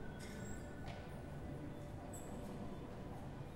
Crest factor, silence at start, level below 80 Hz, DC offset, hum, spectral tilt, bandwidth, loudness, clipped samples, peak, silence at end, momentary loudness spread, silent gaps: 14 dB; 0 s; -56 dBFS; under 0.1%; none; -6 dB/octave; 16 kHz; -50 LUFS; under 0.1%; -34 dBFS; 0 s; 1 LU; none